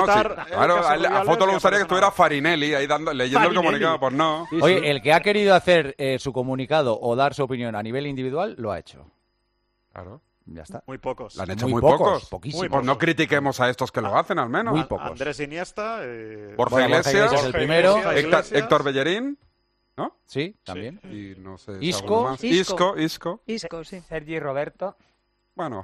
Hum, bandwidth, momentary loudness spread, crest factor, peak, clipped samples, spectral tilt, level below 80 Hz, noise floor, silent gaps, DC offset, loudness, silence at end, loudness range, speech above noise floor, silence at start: none; 14 kHz; 16 LU; 18 dB; -4 dBFS; under 0.1%; -5 dB/octave; -52 dBFS; -71 dBFS; none; under 0.1%; -21 LUFS; 0 s; 9 LU; 49 dB; 0 s